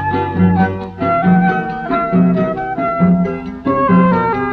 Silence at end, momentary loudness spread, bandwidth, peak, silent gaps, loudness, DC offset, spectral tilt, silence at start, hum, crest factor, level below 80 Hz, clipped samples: 0 s; 7 LU; 4.7 kHz; 0 dBFS; none; -14 LUFS; under 0.1%; -10.5 dB/octave; 0 s; none; 14 dB; -40 dBFS; under 0.1%